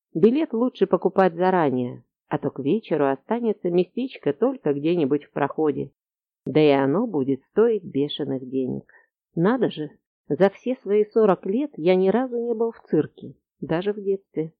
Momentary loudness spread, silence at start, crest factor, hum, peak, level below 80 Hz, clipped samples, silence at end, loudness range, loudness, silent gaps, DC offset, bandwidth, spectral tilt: 10 LU; 0.15 s; 16 dB; none; -6 dBFS; -66 dBFS; under 0.1%; 0.1 s; 3 LU; -23 LUFS; 10.06-10.25 s; under 0.1%; 5 kHz; -9.5 dB/octave